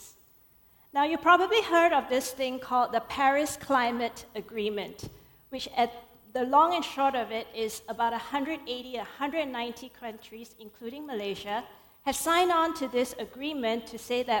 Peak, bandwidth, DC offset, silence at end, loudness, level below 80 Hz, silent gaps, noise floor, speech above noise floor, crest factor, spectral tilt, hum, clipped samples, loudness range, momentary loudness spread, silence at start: -8 dBFS; 18 kHz; under 0.1%; 0 s; -28 LUFS; -62 dBFS; none; -60 dBFS; 32 dB; 20 dB; -3 dB/octave; none; under 0.1%; 9 LU; 18 LU; 0 s